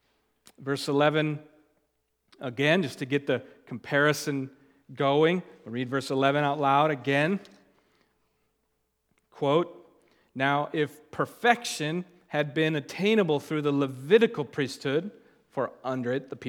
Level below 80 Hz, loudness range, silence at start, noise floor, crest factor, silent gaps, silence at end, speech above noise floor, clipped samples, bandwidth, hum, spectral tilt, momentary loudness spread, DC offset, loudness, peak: -78 dBFS; 5 LU; 0.6 s; -76 dBFS; 24 dB; none; 0 s; 49 dB; under 0.1%; 17.5 kHz; none; -5.5 dB/octave; 12 LU; under 0.1%; -27 LUFS; -4 dBFS